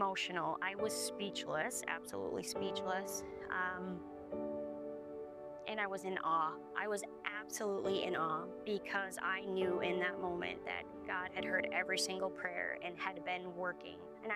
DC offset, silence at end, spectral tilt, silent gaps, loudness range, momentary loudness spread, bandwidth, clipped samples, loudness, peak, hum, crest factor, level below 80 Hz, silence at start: under 0.1%; 0 s; -3 dB/octave; none; 4 LU; 8 LU; 15.5 kHz; under 0.1%; -40 LUFS; -22 dBFS; none; 18 dB; -72 dBFS; 0 s